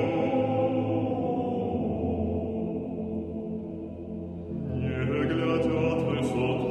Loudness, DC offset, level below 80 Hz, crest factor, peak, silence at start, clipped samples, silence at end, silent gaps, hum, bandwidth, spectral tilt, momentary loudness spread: -29 LUFS; under 0.1%; -48 dBFS; 14 dB; -14 dBFS; 0 s; under 0.1%; 0 s; none; none; 10.5 kHz; -8 dB/octave; 10 LU